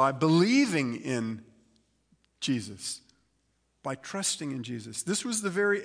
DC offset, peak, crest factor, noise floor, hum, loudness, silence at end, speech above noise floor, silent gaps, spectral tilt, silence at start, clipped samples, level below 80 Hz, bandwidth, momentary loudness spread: under 0.1%; -12 dBFS; 18 dB; -73 dBFS; none; -29 LUFS; 0 s; 45 dB; none; -4.5 dB/octave; 0 s; under 0.1%; -74 dBFS; 10.5 kHz; 14 LU